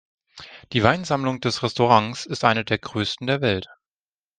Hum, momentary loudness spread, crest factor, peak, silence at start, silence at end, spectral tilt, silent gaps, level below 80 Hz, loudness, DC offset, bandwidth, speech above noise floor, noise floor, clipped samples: none; 11 LU; 22 dB; 0 dBFS; 0.35 s; 0.75 s; -5 dB/octave; none; -56 dBFS; -22 LUFS; under 0.1%; 9.6 kHz; over 68 dB; under -90 dBFS; under 0.1%